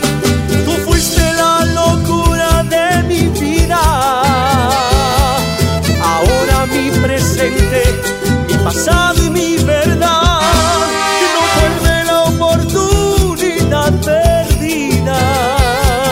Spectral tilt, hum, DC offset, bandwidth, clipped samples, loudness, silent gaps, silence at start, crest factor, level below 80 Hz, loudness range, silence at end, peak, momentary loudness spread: -4.5 dB/octave; none; under 0.1%; 16.5 kHz; under 0.1%; -12 LUFS; none; 0 s; 12 dB; -20 dBFS; 1 LU; 0 s; 0 dBFS; 3 LU